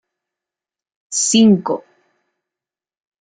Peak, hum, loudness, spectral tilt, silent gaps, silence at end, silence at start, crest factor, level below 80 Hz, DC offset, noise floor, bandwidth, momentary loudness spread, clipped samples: -2 dBFS; none; -15 LUFS; -4 dB/octave; none; 1.5 s; 1.1 s; 18 dB; -60 dBFS; under 0.1%; -88 dBFS; 9.6 kHz; 13 LU; under 0.1%